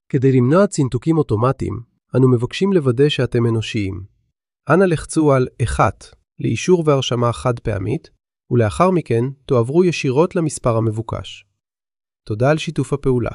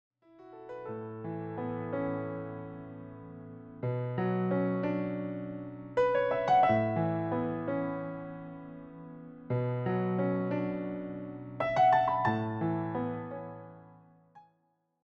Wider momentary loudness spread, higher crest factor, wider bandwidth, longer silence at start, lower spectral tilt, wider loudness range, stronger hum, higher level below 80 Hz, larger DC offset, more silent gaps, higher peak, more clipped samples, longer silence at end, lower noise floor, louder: second, 10 LU vs 20 LU; about the same, 16 dB vs 18 dB; first, 11.5 kHz vs 7.4 kHz; second, 0.15 s vs 0.4 s; second, -6.5 dB/octave vs -9 dB/octave; second, 3 LU vs 8 LU; neither; first, -40 dBFS vs -64 dBFS; neither; neither; first, -2 dBFS vs -14 dBFS; neither; second, 0 s vs 0.65 s; about the same, -78 dBFS vs -75 dBFS; first, -18 LUFS vs -32 LUFS